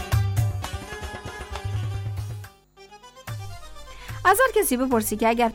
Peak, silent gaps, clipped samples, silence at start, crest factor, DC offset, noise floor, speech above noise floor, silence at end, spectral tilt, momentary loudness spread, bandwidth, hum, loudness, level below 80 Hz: -8 dBFS; none; under 0.1%; 0 s; 16 dB; under 0.1%; -49 dBFS; 29 dB; 0 s; -5 dB/octave; 22 LU; 19 kHz; none; -24 LUFS; -40 dBFS